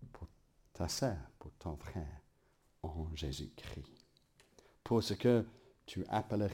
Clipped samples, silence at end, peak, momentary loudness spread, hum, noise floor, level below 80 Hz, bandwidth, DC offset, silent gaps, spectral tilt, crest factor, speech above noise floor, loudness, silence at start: under 0.1%; 0 s; -18 dBFS; 23 LU; none; -72 dBFS; -54 dBFS; 16.5 kHz; under 0.1%; none; -6 dB/octave; 20 dB; 35 dB; -39 LUFS; 0 s